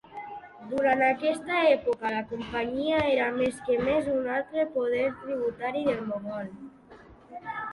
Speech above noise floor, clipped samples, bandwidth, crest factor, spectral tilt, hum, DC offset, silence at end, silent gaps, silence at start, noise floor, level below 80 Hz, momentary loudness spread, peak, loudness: 24 dB; under 0.1%; 11.5 kHz; 18 dB; -5.5 dB/octave; none; under 0.1%; 0 s; none; 0.1 s; -51 dBFS; -58 dBFS; 17 LU; -10 dBFS; -27 LUFS